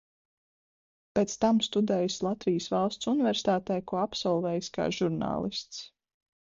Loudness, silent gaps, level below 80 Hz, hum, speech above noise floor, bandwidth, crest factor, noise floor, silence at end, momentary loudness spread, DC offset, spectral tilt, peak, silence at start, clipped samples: -29 LUFS; none; -62 dBFS; none; over 61 dB; 7.8 kHz; 18 dB; under -90 dBFS; 0.6 s; 7 LU; under 0.1%; -5 dB/octave; -12 dBFS; 1.15 s; under 0.1%